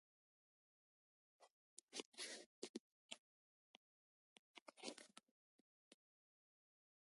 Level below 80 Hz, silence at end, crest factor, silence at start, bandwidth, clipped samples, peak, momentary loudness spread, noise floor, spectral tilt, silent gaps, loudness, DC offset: under -90 dBFS; 1.05 s; 30 dB; 1.4 s; 11.5 kHz; under 0.1%; -32 dBFS; 14 LU; under -90 dBFS; -1 dB/octave; 1.50-1.88 s, 2.05-2.12 s, 2.46-2.62 s, 2.69-2.74 s, 2.80-3.09 s, 3.18-4.55 s, 4.61-4.66 s, 5.31-5.91 s; -56 LUFS; under 0.1%